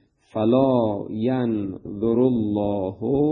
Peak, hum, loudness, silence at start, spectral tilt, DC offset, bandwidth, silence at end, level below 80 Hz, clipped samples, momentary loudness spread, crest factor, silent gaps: -6 dBFS; none; -22 LUFS; 0.35 s; -11 dB/octave; under 0.1%; 4.3 kHz; 0 s; -52 dBFS; under 0.1%; 8 LU; 16 dB; none